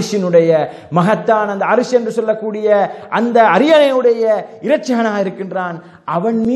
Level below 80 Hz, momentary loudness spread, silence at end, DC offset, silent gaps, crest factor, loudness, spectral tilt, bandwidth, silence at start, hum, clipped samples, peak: -62 dBFS; 10 LU; 0 s; under 0.1%; none; 14 dB; -14 LUFS; -6 dB/octave; 12 kHz; 0 s; none; under 0.1%; 0 dBFS